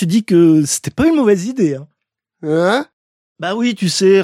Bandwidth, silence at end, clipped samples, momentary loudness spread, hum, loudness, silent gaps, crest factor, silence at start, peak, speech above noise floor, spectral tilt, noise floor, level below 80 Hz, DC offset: 15.5 kHz; 0 s; under 0.1%; 13 LU; none; -14 LUFS; 2.93-3.36 s; 14 dB; 0 s; -2 dBFS; 56 dB; -5 dB/octave; -69 dBFS; -48 dBFS; under 0.1%